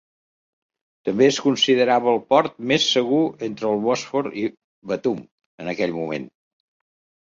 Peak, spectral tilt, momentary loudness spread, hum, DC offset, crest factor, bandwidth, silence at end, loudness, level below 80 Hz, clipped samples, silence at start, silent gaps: -2 dBFS; -4 dB/octave; 12 LU; none; under 0.1%; 20 dB; 7.6 kHz; 0.95 s; -21 LUFS; -66 dBFS; under 0.1%; 1.05 s; 4.64-4.82 s, 5.31-5.38 s, 5.46-5.58 s